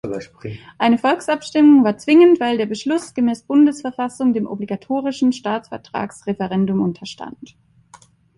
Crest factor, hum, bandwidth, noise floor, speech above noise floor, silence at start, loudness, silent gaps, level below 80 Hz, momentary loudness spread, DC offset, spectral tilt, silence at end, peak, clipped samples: 16 dB; none; 11.5 kHz; -49 dBFS; 32 dB; 0.05 s; -17 LUFS; none; -58 dBFS; 17 LU; under 0.1%; -6 dB/octave; 0.95 s; -2 dBFS; under 0.1%